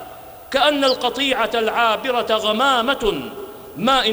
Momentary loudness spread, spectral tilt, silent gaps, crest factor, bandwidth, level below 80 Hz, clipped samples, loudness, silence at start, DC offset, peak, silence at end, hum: 16 LU; -3 dB/octave; none; 14 dB; over 20 kHz; -46 dBFS; under 0.1%; -18 LUFS; 0 s; under 0.1%; -4 dBFS; 0 s; none